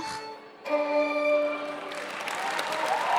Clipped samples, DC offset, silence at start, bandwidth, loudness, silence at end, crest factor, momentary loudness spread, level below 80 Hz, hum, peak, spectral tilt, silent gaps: under 0.1%; under 0.1%; 0 s; 16.5 kHz; -29 LUFS; 0 s; 16 dB; 11 LU; -76 dBFS; none; -14 dBFS; -2.5 dB/octave; none